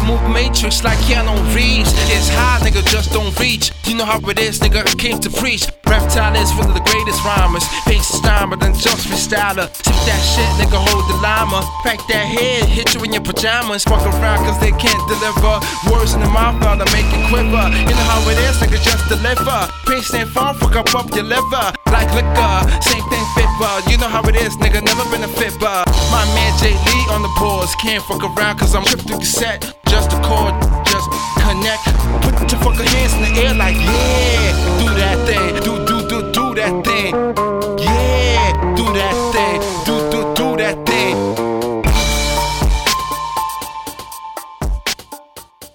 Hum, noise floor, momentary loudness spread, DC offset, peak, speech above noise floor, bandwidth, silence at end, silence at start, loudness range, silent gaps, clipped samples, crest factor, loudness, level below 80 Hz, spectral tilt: none; -38 dBFS; 4 LU; under 0.1%; 0 dBFS; 24 dB; 19.5 kHz; 0.05 s; 0 s; 2 LU; none; under 0.1%; 14 dB; -15 LUFS; -18 dBFS; -4 dB/octave